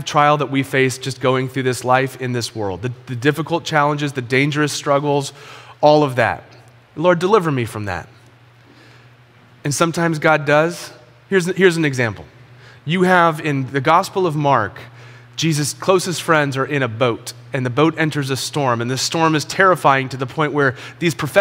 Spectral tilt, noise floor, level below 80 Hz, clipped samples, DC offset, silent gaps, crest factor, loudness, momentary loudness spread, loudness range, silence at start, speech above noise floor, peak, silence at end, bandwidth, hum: -5 dB/octave; -48 dBFS; -58 dBFS; under 0.1%; under 0.1%; none; 18 dB; -17 LUFS; 12 LU; 3 LU; 0 s; 30 dB; 0 dBFS; 0 s; 16.5 kHz; none